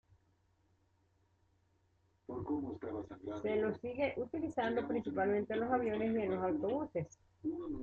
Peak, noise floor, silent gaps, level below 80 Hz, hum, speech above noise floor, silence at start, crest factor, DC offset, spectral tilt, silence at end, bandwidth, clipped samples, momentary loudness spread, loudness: -22 dBFS; -75 dBFS; none; -68 dBFS; none; 38 dB; 2.3 s; 16 dB; under 0.1%; -5.5 dB/octave; 0 s; 7.6 kHz; under 0.1%; 10 LU; -38 LUFS